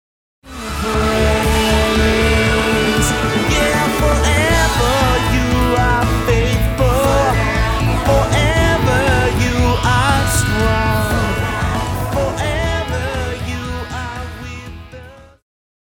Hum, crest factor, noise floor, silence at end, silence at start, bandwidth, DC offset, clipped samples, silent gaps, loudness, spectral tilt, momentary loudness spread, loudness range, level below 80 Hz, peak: none; 14 dB; -37 dBFS; 0.7 s; 0.45 s; 19 kHz; under 0.1%; under 0.1%; none; -15 LUFS; -5 dB/octave; 11 LU; 7 LU; -22 dBFS; -2 dBFS